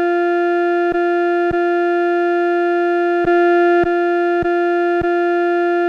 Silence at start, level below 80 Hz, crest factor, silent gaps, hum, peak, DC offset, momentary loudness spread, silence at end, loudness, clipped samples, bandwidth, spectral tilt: 0 s; -48 dBFS; 8 dB; none; none; -6 dBFS; under 0.1%; 3 LU; 0 s; -16 LUFS; under 0.1%; 5.2 kHz; -7 dB/octave